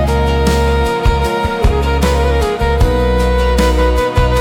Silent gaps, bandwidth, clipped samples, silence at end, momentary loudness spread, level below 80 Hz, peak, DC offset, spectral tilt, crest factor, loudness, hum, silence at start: none; 16.5 kHz; under 0.1%; 0 s; 2 LU; -16 dBFS; -2 dBFS; under 0.1%; -6 dB/octave; 10 dB; -14 LUFS; none; 0 s